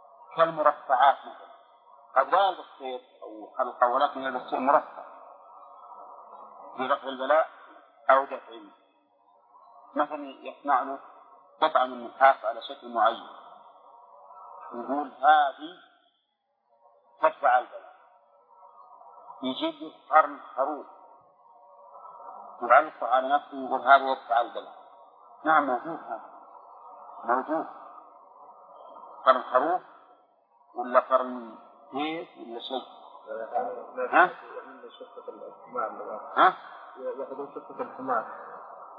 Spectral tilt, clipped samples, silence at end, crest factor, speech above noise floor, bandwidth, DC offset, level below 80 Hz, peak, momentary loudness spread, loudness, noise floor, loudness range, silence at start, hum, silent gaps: -7 dB/octave; under 0.1%; 0 s; 24 dB; 49 dB; 4.9 kHz; under 0.1%; under -90 dBFS; -4 dBFS; 24 LU; -26 LUFS; -76 dBFS; 5 LU; 0.3 s; none; none